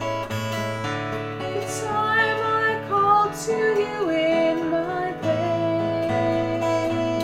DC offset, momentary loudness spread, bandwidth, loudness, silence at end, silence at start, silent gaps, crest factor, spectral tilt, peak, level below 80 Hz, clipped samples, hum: under 0.1%; 7 LU; 16 kHz; -23 LUFS; 0 s; 0 s; none; 16 dB; -5.5 dB/octave; -6 dBFS; -54 dBFS; under 0.1%; none